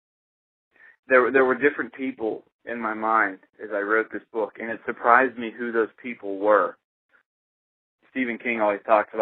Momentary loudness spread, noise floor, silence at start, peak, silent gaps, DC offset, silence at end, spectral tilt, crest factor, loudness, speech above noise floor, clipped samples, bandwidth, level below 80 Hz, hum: 13 LU; under -90 dBFS; 1.1 s; 0 dBFS; 2.52-2.59 s, 6.84-7.09 s, 7.26-7.99 s; under 0.1%; 0 s; -8 dB/octave; 24 dB; -23 LUFS; over 67 dB; under 0.1%; 4.2 kHz; -74 dBFS; none